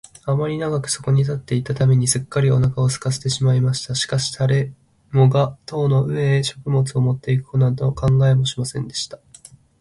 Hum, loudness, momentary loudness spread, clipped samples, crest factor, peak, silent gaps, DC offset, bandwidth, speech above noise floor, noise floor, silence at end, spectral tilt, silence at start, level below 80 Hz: none; -19 LUFS; 8 LU; under 0.1%; 16 dB; -4 dBFS; none; under 0.1%; 11.5 kHz; 28 dB; -47 dBFS; 0.65 s; -5.5 dB/octave; 0.25 s; -46 dBFS